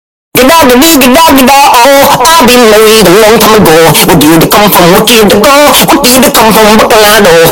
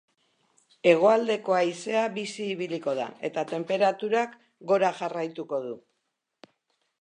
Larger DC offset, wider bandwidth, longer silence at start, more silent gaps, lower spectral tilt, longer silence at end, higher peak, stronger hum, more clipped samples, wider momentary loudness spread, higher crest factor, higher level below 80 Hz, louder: neither; first, over 20 kHz vs 10 kHz; second, 0.35 s vs 0.85 s; neither; second, -3.5 dB/octave vs -5 dB/octave; second, 0 s vs 1.25 s; first, 0 dBFS vs -6 dBFS; neither; first, 10% vs under 0.1%; second, 1 LU vs 12 LU; second, 2 dB vs 22 dB; first, -26 dBFS vs -84 dBFS; first, -1 LUFS vs -26 LUFS